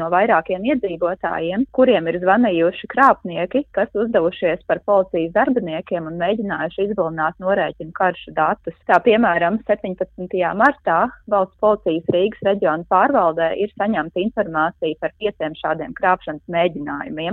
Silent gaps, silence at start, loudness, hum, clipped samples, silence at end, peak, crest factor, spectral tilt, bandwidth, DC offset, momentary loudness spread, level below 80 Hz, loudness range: none; 0 s; -19 LUFS; none; under 0.1%; 0 s; 0 dBFS; 18 dB; -8 dB/octave; 6.2 kHz; under 0.1%; 9 LU; -52 dBFS; 4 LU